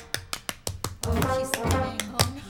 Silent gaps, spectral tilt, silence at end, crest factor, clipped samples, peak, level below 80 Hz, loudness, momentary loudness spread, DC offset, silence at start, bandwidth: none; -4 dB/octave; 0 s; 26 dB; under 0.1%; -2 dBFS; -40 dBFS; -28 LUFS; 8 LU; under 0.1%; 0 s; over 20 kHz